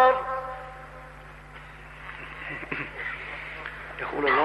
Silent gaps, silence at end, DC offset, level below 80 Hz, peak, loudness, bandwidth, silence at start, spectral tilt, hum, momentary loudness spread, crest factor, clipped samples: none; 0 s; under 0.1%; -50 dBFS; -10 dBFS; -31 LUFS; 12 kHz; 0 s; -5.5 dB/octave; none; 17 LU; 20 dB; under 0.1%